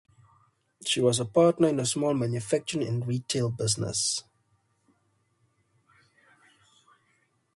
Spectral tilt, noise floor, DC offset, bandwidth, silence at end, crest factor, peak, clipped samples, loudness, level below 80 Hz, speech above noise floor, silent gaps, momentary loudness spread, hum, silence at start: -4.5 dB/octave; -71 dBFS; under 0.1%; 11.5 kHz; 3.35 s; 20 dB; -10 dBFS; under 0.1%; -27 LUFS; -64 dBFS; 45 dB; none; 8 LU; none; 0.8 s